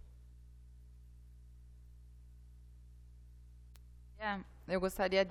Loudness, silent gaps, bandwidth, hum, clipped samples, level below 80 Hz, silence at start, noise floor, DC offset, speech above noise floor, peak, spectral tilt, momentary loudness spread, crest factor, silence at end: -37 LUFS; none; 15 kHz; 60 Hz at -55 dBFS; under 0.1%; -56 dBFS; 0.05 s; -56 dBFS; under 0.1%; 21 dB; -18 dBFS; -5 dB/octave; 24 LU; 24 dB; 0 s